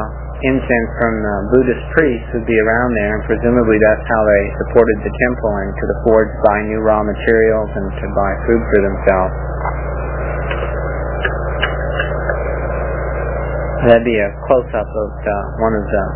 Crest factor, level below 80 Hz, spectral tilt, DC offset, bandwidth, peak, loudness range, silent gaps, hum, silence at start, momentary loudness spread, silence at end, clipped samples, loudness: 16 dB; -24 dBFS; -11 dB/octave; under 0.1%; 4 kHz; 0 dBFS; 6 LU; none; none; 0 s; 8 LU; 0 s; under 0.1%; -16 LUFS